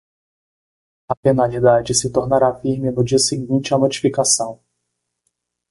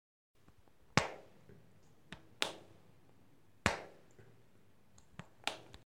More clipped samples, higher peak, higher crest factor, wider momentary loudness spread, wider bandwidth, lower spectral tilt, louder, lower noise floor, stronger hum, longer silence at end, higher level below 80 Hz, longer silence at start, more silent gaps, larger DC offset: neither; first, -2 dBFS vs -8 dBFS; second, 16 dB vs 38 dB; second, 6 LU vs 26 LU; second, 12 kHz vs 16 kHz; about the same, -4.5 dB/octave vs -3.5 dB/octave; first, -17 LUFS vs -39 LUFS; first, -76 dBFS vs -69 dBFS; first, 60 Hz at -35 dBFS vs none; first, 1.15 s vs 0.25 s; first, -50 dBFS vs -64 dBFS; first, 1.1 s vs 0.95 s; first, 1.17-1.23 s vs none; neither